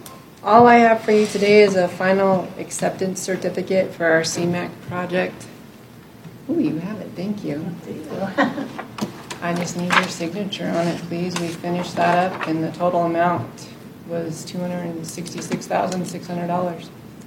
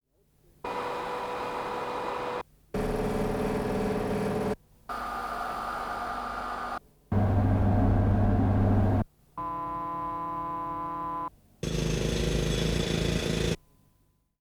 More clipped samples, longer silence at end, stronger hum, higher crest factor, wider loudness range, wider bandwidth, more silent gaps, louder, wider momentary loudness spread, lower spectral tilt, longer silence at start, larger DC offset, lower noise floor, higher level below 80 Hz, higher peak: neither; second, 0 s vs 0.85 s; neither; about the same, 20 dB vs 16 dB; first, 9 LU vs 6 LU; about the same, 17 kHz vs 16 kHz; neither; first, -20 LUFS vs -30 LUFS; first, 15 LU vs 12 LU; second, -5 dB/octave vs -6.5 dB/octave; second, 0 s vs 0.65 s; neither; second, -43 dBFS vs -68 dBFS; second, -60 dBFS vs -38 dBFS; first, 0 dBFS vs -12 dBFS